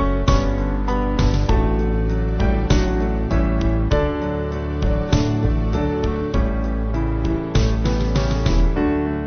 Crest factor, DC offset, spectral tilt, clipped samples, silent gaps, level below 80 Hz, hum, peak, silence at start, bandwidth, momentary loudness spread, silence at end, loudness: 16 dB; under 0.1%; -7 dB/octave; under 0.1%; none; -22 dBFS; none; -4 dBFS; 0 s; 6.6 kHz; 4 LU; 0 s; -21 LUFS